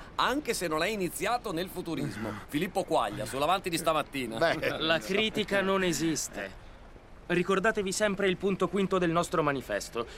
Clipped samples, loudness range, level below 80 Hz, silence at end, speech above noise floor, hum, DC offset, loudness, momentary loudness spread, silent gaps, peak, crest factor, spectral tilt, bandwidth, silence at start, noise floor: under 0.1%; 3 LU; -52 dBFS; 0 s; 20 dB; none; under 0.1%; -29 LUFS; 7 LU; none; -12 dBFS; 18 dB; -4 dB/octave; 16 kHz; 0 s; -49 dBFS